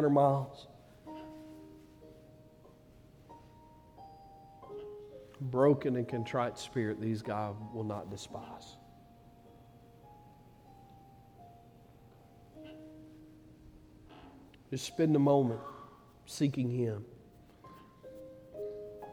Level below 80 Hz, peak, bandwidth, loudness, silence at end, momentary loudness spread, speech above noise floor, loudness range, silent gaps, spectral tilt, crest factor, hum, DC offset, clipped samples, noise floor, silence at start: -66 dBFS; -14 dBFS; 15.5 kHz; -34 LUFS; 0 s; 29 LU; 27 dB; 22 LU; none; -7 dB/octave; 22 dB; none; under 0.1%; under 0.1%; -59 dBFS; 0 s